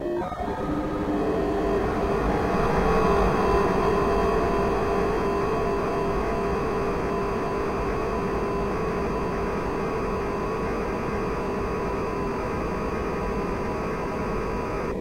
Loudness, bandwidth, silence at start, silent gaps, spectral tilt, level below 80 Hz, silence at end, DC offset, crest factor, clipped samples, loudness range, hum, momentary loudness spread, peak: -26 LUFS; 16 kHz; 0 s; none; -7 dB/octave; -36 dBFS; 0 s; 0.4%; 16 dB; under 0.1%; 5 LU; none; 6 LU; -10 dBFS